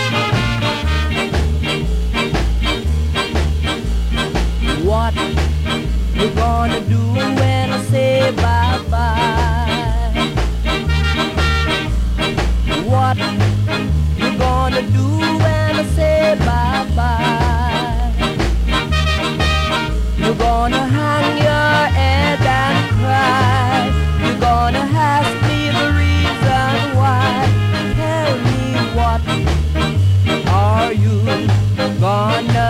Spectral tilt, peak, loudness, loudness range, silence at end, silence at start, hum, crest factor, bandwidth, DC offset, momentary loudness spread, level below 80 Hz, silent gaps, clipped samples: -6 dB/octave; -6 dBFS; -16 LUFS; 3 LU; 0 s; 0 s; none; 10 dB; 15.5 kHz; under 0.1%; 4 LU; -22 dBFS; none; under 0.1%